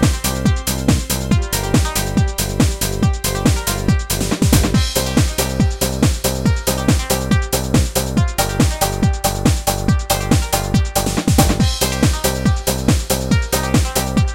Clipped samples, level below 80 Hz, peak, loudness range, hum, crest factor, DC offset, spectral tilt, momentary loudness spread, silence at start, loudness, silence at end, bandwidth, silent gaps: under 0.1%; -22 dBFS; 0 dBFS; 1 LU; none; 16 dB; 0.2%; -4.5 dB/octave; 3 LU; 0 s; -17 LUFS; 0 s; 17 kHz; none